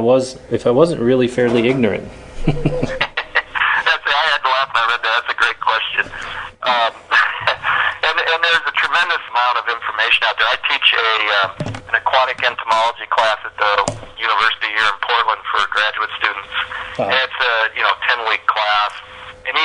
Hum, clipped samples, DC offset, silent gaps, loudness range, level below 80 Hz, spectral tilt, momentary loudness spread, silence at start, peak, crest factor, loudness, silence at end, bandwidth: none; under 0.1%; under 0.1%; none; 2 LU; -40 dBFS; -4 dB/octave; 8 LU; 0 s; 0 dBFS; 18 dB; -16 LUFS; 0 s; 10.5 kHz